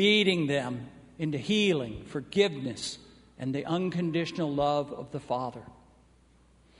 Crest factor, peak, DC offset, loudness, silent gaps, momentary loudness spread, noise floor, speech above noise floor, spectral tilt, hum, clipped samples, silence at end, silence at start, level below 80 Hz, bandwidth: 20 dB; -10 dBFS; under 0.1%; -30 LUFS; none; 13 LU; -61 dBFS; 32 dB; -5 dB/octave; none; under 0.1%; 1.05 s; 0 s; -60 dBFS; 10.5 kHz